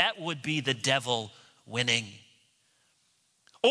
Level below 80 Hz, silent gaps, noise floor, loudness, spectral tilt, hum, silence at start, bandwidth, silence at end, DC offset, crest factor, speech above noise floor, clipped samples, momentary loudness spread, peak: -74 dBFS; none; -70 dBFS; -29 LUFS; -3 dB/octave; none; 0 s; 11 kHz; 0 s; under 0.1%; 22 dB; 40 dB; under 0.1%; 9 LU; -8 dBFS